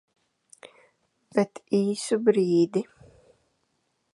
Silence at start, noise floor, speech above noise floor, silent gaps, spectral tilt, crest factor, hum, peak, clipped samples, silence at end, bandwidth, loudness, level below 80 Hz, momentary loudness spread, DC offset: 0.65 s; -74 dBFS; 50 dB; none; -6 dB/octave; 20 dB; none; -8 dBFS; under 0.1%; 1.3 s; 11.5 kHz; -25 LUFS; -72 dBFS; 8 LU; under 0.1%